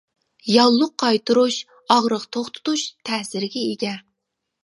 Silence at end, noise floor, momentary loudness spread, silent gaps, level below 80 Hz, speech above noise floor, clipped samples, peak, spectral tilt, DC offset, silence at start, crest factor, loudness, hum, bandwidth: 0.65 s; -79 dBFS; 12 LU; none; -72 dBFS; 59 dB; under 0.1%; 0 dBFS; -3.5 dB/octave; under 0.1%; 0.45 s; 20 dB; -20 LUFS; none; 11.5 kHz